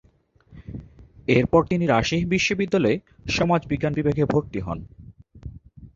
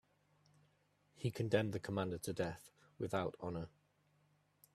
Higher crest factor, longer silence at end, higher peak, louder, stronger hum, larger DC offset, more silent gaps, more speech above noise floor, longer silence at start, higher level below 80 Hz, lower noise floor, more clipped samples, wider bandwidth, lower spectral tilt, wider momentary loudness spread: about the same, 20 dB vs 24 dB; second, 0.1 s vs 1.05 s; first, -2 dBFS vs -18 dBFS; first, -22 LUFS vs -41 LUFS; second, none vs 50 Hz at -65 dBFS; neither; neither; about the same, 36 dB vs 36 dB; second, 0.5 s vs 1.2 s; first, -44 dBFS vs -72 dBFS; second, -57 dBFS vs -76 dBFS; neither; second, 7.6 kHz vs 14 kHz; about the same, -6 dB/octave vs -6 dB/octave; first, 20 LU vs 11 LU